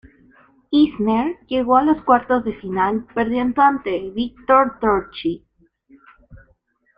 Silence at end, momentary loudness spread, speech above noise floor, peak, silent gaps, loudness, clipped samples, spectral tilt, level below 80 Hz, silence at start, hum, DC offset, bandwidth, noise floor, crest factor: 0.6 s; 10 LU; 43 dB; -2 dBFS; none; -19 LUFS; under 0.1%; -8.5 dB/octave; -50 dBFS; 0.7 s; none; under 0.1%; 5.2 kHz; -61 dBFS; 18 dB